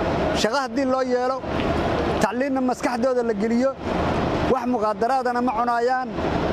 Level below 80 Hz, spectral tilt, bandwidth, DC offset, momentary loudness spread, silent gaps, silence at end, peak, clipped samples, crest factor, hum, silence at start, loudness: -40 dBFS; -5.5 dB/octave; 14.5 kHz; under 0.1%; 3 LU; none; 0 s; -6 dBFS; under 0.1%; 16 dB; none; 0 s; -22 LUFS